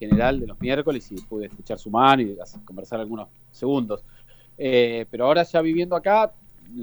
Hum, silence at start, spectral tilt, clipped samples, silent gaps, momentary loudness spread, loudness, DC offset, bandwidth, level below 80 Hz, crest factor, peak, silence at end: none; 0 s; -7 dB/octave; under 0.1%; none; 16 LU; -22 LUFS; under 0.1%; over 20 kHz; -44 dBFS; 22 dB; -2 dBFS; 0 s